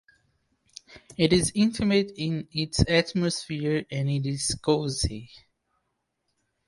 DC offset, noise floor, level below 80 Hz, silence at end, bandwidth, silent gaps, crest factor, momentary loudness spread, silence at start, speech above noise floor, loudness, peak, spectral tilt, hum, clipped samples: under 0.1%; -78 dBFS; -44 dBFS; 1.3 s; 11.5 kHz; none; 22 dB; 9 LU; 0.9 s; 53 dB; -26 LUFS; -6 dBFS; -5 dB/octave; none; under 0.1%